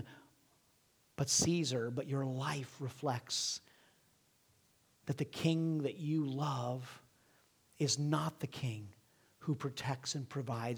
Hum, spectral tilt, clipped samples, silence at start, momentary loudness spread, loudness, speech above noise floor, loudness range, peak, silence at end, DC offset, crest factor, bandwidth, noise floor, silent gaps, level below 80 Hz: none; -4.5 dB/octave; under 0.1%; 0 s; 12 LU; -37 LUFS; 35 dB; 4 LU; -18 dBFS; 0 s; under 0.1%; 20 dB; over 20 kHz; -72 dBFS; none; -74 dBFS